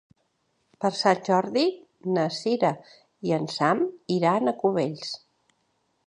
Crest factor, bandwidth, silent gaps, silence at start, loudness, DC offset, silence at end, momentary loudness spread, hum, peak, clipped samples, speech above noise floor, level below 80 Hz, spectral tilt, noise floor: 20 dB; 10.5 kHz; none; 0.8 s; -25 LUFS; under 0.1%; 0.9 s; 12 LU; none; -6 dBFS; under 0.1%; 48 dB; -74 dBFS; -5.5 dB/octave; -72 dBFS